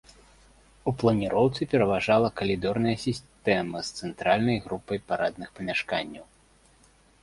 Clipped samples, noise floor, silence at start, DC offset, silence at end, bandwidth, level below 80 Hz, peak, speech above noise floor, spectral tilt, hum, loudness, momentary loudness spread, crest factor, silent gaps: under 0.1%; -60 dBFS; 0.85 s; under 0.1%; 1 s; 11.5 kHz; -54 dBFS; -8 dBFS; 33 dB; -6 dB/octave; none; -27 LUFS; 10 LU; 20 dB; none